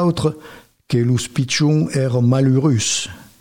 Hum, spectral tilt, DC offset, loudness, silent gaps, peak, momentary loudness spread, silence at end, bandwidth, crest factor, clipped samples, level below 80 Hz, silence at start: none; -5.5 dB/octave; under 0.1%; -17 LUFS; none; -6 dBFS; 7 LU; 0.2 s; 15.5 kHz; 12 dB; under 0.1%; -50 dBFS; 0 s